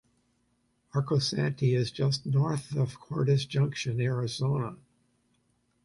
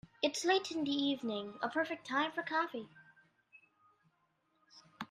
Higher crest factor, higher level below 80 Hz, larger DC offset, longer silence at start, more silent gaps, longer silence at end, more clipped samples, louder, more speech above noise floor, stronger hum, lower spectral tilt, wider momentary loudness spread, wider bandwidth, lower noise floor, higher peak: second, 14 dB vs 20 dB; first, -64 dBFS vs -82 dBFS; neither; first, 0.95 s vs 0.2 s; neither; first, 1.1 s vs 0.05 s; neither; first, -29 LUFS vs -36 LUFS; about the same, 44 dB vs 42 dB; neither; first, -6 dB/octave vs -3 dB/octave; second, 5 LU vs 9 LU; second, 11.5 kHz vs 13.5 kHz; second, -72 dBFS vs -78 dBFS; first, -14 dBFS vs -18 dBFS